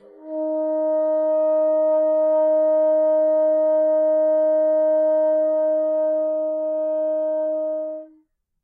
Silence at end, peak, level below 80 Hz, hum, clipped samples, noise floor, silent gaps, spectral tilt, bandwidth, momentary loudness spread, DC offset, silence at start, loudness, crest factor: 0.55 s; -14 dBFS; -86 dBFS; none; under 0.1%; -60 dBFS; none; -7.5 dB/octave; 2 kHz; 6 LU; under 0.1%; 0.2 s; -20 LUFS; 6 dB